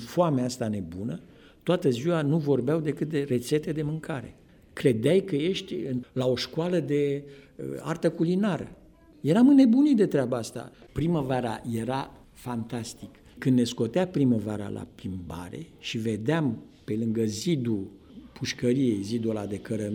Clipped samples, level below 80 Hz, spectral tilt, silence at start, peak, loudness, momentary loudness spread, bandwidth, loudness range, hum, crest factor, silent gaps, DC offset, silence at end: under 0.1%; -58 dBFS; -6.5 dB/octave; 0 s; -8 dBFS; -27 LUFS; 14 LU; 17.5 kHz; 6 LU; none; 18 dB; none; under 0.1%; 0 s